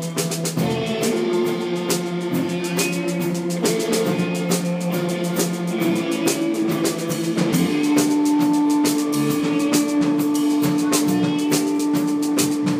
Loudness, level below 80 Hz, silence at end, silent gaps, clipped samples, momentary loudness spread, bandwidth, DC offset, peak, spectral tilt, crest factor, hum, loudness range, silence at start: -20 LUFS; -66 dBFS; 0 s; none; under 0.1%; 5 LU; 15.5 kHz; under 0.1%; -6 dBFS; -5 dB/octave; 14 dB; none; 3 LU; 0 s